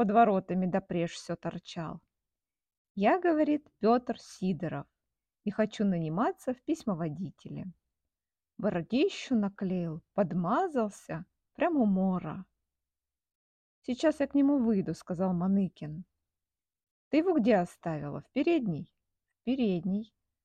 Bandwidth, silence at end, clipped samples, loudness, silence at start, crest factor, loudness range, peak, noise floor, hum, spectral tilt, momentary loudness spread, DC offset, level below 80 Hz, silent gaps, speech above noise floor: 9.6 kHz; 0.4 s; under 0.1%; -31 LUFS; 0 s; 20 dB; 3 LU; -12 dBFS; under -90 dBFS; none; -7.5 dB/octave; 15 LU; under 0.1%; -66 dBFS; 2.78-2.95 s, 13.35-13.82 s, 16.91-17.11 s; over 60 dB